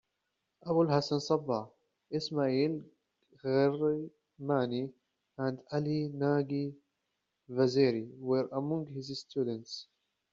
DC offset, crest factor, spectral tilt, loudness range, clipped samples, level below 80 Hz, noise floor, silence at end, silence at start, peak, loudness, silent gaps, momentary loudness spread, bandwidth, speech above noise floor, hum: under 0.1%; 20 dB; -6 dB/octave; 2 LU; under 0.1%; -74 dBFS; -84 dBFS; 0.5 s; 0.65 s; -14 dBFS; -33 LUFS; none; 13 LU; 7.6 kHz; 52 dB; none